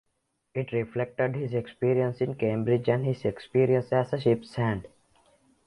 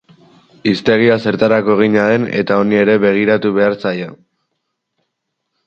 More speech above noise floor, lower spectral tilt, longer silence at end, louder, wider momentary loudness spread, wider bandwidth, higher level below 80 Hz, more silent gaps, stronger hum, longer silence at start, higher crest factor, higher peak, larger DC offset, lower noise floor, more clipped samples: second, 50 dB vs 60 dB; first, -9 dB/octave vs -7.5 dB/octave; second, 0.8 s vs 1.5 s; second, -28 LUFS vs -13 LUFS; about the same, 7 LU vs 8 LU; first, 11 kHz vs 7.2 kHz; second, -60 dBFS vs -54 dBFS; neither; neither; about the same, 0.55 s vs 0.65 s; about the same, 18 dB vs 14 dB; second, -10 dBFS vs 0 dBFS; neither; first, -77 dBFS vs -73 dBFS; neither